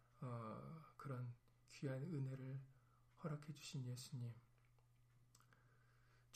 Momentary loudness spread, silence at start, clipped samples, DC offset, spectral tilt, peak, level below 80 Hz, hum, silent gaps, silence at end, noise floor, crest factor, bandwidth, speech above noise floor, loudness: 10 LU; 0 s; under 0.1%; under 0.1%; -6.5 dB/octave; -36 dBFS; -80 dBFS; none; none; 0 s; -74 dBFS; 18 dB; 15 kHz; 25 dB; -52 LUFS